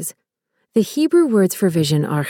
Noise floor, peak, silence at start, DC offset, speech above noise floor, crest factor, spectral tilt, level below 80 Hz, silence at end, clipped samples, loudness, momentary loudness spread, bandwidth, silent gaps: -72 dBFS; -4 dBFS; 0 s; under 0.1%; 56 dB; 14 dB; -6 dB/octave; -62 dBFS; 0 s; under 0.1%; -17 LUFS; 7 LU; 18 kHz; none